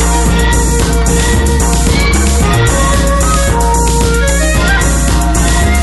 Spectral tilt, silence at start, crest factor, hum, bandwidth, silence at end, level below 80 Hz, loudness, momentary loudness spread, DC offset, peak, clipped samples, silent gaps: -4.5 dB/octave; 0 s; 10 dB; none; 12.5 kHz; 0 s; -12 dBFS; -11 LUFS; 1 LU; under 0.1%; 0 dBFS; under 0.1%; none